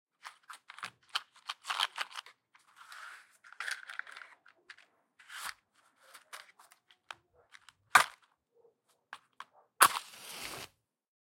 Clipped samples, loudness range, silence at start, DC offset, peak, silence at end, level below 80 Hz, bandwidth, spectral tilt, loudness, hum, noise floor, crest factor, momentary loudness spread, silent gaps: under 0.1%; 18 LU; 0.25 s; under 0.1%; 0 dBFS; 0.55 s; -82 dBFS; 16.5 kHz; 1 dB/octave; -33 LUFS; none; -71 dBFS; 38 dB; 28 LU; none